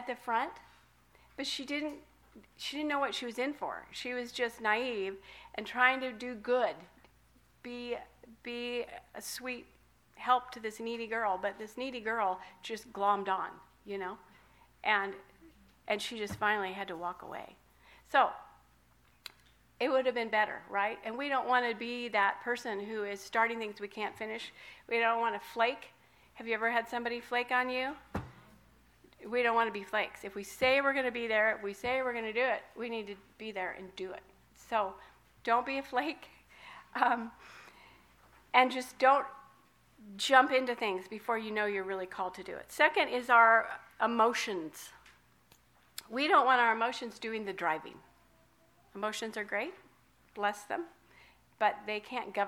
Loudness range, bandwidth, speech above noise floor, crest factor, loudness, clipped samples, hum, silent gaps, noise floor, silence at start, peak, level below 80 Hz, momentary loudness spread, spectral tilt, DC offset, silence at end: 8 LU; 18.5 kHz; 34 dB; 26 dB; -33 LUFS; under 0.1%; none; none; -67 dBFS; 0 s; -8 dBFS; -70 dBFS; 18 LU; -3 dB/octave; under 0.1%; 0 s